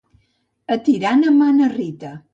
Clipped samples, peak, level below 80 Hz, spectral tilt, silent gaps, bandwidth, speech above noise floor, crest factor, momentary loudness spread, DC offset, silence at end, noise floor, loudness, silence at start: under 0.1%; -4 dBFS; -64 dBFS; -6.5 dB/octave; none; 7.6 kHz; 49 dB; 12 dB; 14 LU; under 0.1%; 0.15 s; -65 dBFS; -16 LUFS; 0.7 s